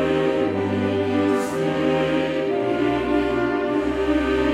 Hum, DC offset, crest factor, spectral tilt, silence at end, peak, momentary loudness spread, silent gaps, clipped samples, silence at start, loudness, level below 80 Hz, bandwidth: none; under 0.1%; 12 dB; -6.5 dB/octave; 0 s; -8 dBFS; 2 LU; none; under 0.1%; 0 s; -21 LUFS; -42 dBFS; 13 kHz